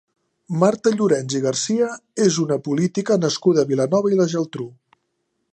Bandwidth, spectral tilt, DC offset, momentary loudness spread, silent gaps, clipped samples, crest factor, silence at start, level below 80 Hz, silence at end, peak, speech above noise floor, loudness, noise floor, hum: 10 kHz; -5.5 dB/octave; under 0.1%; 7 LU; none; under 0.1%; 18 dB; 0.5 s; -68 dBFS; 0.85 s; -2 dBFS; 54 dB; -20 LUFS; -73 dBFS; none